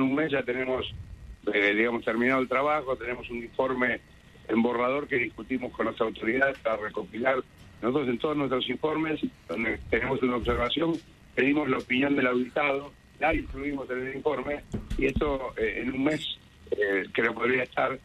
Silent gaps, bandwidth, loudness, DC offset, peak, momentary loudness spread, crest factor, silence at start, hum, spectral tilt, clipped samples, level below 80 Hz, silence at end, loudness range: none; 12.5 kHz; -28 LUFS; under 0.1%; -10 dBFS; 9 LU; 18 dB; 0 s; none; -6.5 dB/octave; under 0.1%; -46 dBFS; 0.05 s; 3 LU